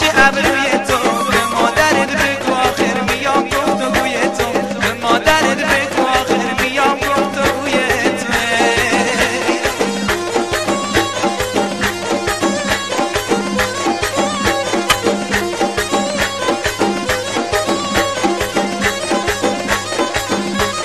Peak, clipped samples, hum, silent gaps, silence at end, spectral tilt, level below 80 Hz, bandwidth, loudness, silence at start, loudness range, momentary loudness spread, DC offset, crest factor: 0 dBFS; under 0.1%; none; none; 0 s; -3 dB/octave; -38 dBFS; 13.5 kHz; -15 LUFS; 0 s; 2 LU; 5 LU; 0.5%; 16 dB